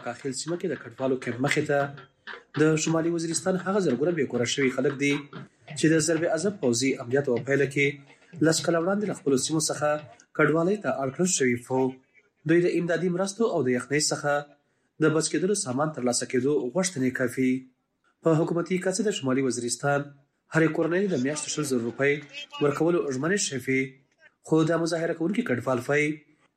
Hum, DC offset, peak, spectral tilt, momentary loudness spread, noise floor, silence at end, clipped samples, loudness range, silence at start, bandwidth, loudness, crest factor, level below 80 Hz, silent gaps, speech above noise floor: none; under 0.1%; -6 dBFS; -4.5 dB/octave; 7 LU; -70 dBFS; 0.35 s; under 0.1%; 1 LU; 0 s; 14.5 kHz; -26 LUFS; 20 dB; -70 dBFS; none; 44 dB